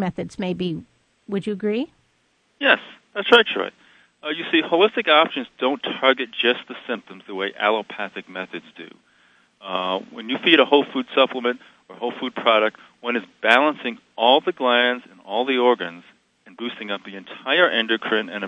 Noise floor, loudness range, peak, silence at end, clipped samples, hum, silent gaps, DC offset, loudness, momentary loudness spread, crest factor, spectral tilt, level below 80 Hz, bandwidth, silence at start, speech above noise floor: -65 dBFS; 6 LU; 0 dBFS; 0 s; under 0.1%; none; none; under 0.1%; -20 LUFS; 16 LU; 22 dB; -5.5 dB/octave; -68 dBFS; 11 kHz; 0 s; 44 dB